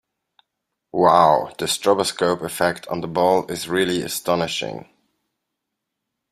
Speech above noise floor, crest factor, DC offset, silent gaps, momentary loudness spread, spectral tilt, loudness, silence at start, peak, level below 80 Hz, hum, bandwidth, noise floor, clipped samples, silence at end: 61 dB; 20 dB; under 0.1%; none; 11 LU; -4 dB/octave; -20 LUFS; 0.95 s; -2 dBFS; -60 dBFS; none; 15.5 kHz; -80 dBFS; under 0.1%; 1.5 s